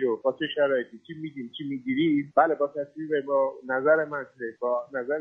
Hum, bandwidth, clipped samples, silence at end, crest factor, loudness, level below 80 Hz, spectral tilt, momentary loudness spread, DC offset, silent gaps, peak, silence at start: none; 3.9 kHz; under 0.1%; 0 s; 20 dB; -27 LUFS; -76 dBFS; -8 dB/octave; 14 LU; under 0.1%; none; -6 dBFS; 0 s